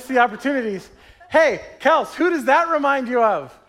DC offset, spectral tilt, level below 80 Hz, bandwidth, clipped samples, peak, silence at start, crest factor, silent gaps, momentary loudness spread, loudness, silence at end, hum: under 0.1%; -4.5 dB/octave; -58 dBFS; 15.5 kHz; under 0.1%; -4 dBFS; 0 s; 16 dB; none; 6 LU; -19 LUFS; 0.2 s; none